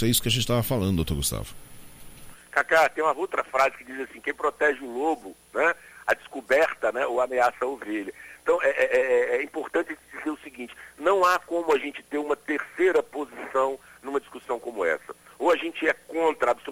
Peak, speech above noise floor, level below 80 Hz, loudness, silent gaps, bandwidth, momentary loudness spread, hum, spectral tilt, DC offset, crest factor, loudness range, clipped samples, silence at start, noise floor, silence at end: -8 dBFS; 19 dB; -48 dBFS; -26 LUFS; none; 16 kHz; 12 LU; none; -4 dB/octave; under 0.1%; 18 dB; 2 LU; under 0.1%; 0 s; -44 dBFS; 0 s